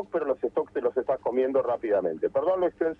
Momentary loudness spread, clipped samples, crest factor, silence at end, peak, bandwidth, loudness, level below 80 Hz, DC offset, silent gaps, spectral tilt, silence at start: 3 LU; under 0.1%; 12 dB; 0.05 s; -14 dBFS; 4.5 kHz; -27 LUFS; -64 dBFS; under 0.1%; none; -8.5 dB/octave; 0 s